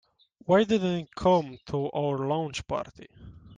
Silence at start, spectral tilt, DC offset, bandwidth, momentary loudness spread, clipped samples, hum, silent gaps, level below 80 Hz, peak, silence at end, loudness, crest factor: 0.5 s; -6.5 dB/octave; under 0.1%; 9.6 kHz; 11 LU; under 0.1%; none; none; -56 dBFS; -10 dBFS; 0 s; -27 LUFS; 18 dB